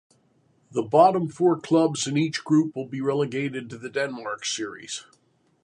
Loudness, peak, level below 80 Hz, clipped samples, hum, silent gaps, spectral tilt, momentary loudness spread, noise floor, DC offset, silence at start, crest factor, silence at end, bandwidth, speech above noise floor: -24 LUFS; -6 dBFS; -72 dBFS; under 0.1%; none; none; -5 dB/octave; 13 LU; -64 dBFS; under 0.1%; 0.75 s; 20 dB; 0.6 s; 11 kHz; 40 dB